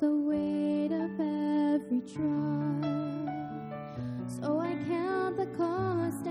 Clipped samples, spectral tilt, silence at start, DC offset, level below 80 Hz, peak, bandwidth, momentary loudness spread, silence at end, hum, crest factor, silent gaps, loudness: under 0.1%; -8 dB/octave; 0 s; under 0.1%; -66 dBFS; -18 dBFS; 14 kHz; 9 LU; 0 s; none; 12 dB; none; -32 LUFS